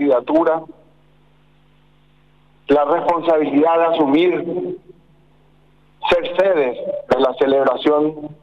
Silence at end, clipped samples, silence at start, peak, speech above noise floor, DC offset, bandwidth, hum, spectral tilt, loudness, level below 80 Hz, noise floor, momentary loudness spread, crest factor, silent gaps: 0.1 s; under 0.1%; 0 s; -6 dBFS; 38 dB; 0.2%; 7.4 kHz; 50 Hz at -55 dBFS; -7 dB/octave; -17 LUFS; -54 dBFS; -55 dBFS; 10 LU; 12 dB; none